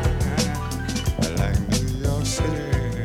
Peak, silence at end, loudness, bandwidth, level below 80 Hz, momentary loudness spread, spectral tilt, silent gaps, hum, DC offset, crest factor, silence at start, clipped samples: -6 dBFS; 0 s; -24 LUFS; 17 kHz; -28 dBFS; 3 LU; -5 dB/octave; none; none; under 0.1%; 18 dB; 0 s; under 0.1%